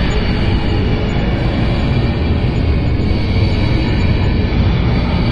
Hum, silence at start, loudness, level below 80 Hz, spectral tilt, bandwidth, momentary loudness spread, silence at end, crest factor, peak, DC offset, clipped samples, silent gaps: none; 0 s; -16 LUFS; -18 dBFS; -8 dB/octave; 7.4 kHz; 2 LU; 0 s; 10 dB; -4 dBFS; under 0.1%; under 0.1%; none